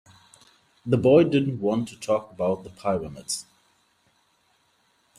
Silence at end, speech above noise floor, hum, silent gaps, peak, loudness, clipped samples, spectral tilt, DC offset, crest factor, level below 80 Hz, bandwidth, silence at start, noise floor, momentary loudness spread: 1.75 s; 43 dB; none; none; -6 dBFS; -24 LUFS; under 0.1%; -6 dB/octave; under 0.1%; 20 dB; -60 dBFS; 14.5 kHz; 0.85 s; -66 dBFS; 13 LU